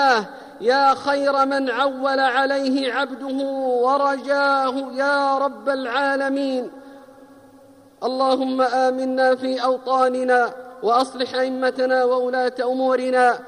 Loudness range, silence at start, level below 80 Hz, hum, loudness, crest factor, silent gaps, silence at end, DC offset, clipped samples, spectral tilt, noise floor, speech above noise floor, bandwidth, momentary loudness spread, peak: 3 LU; 0 s; -70 dBFS; none; -20 LUFS; 14 dB; none; 0 s; under 0.1%; under 0.1%; -3.5 dB/octave; -49 dBFS; 29 dB; 10.5 kHz; 7 LU; -6 dBFS